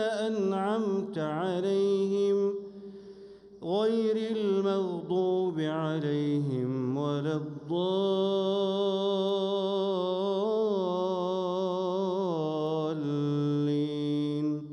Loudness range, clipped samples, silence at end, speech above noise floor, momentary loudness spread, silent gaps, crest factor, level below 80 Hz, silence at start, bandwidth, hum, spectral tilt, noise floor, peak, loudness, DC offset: 2 LU; under 0.1%; 0 s; 21 dB; 5 LU; none; 12 dB; -74 dBFS; 0 s; 10 kHz; none; -7.5 dB/octave; -50 dBFS; -18 dBFS; -29 LUFS; under 0.1%